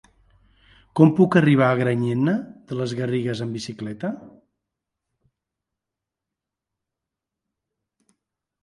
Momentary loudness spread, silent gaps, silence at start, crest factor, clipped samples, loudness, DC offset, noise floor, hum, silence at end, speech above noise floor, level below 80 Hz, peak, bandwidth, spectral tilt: 15 LU; none; 0.95 s; 22 dB; under 0.1%; -21 LUFS; under 0.1%; -86 dBFS; none; 4.35 s; 66 dB; -62 dBFS; -2 dBFS; 11.5 kHz; -8 dB/octave